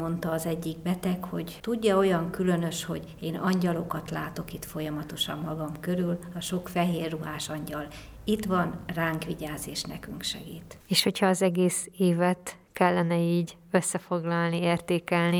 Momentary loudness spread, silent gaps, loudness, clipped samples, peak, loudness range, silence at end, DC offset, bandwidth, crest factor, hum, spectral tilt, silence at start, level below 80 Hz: 11 LU; none; -29 LUFS; under 0.1%; -8 dBFS; 6 LU; 0 s; under 0.1%; over 20 kHz; 20 dB; none; -5 dB/octave; 0 s; -54 dBFS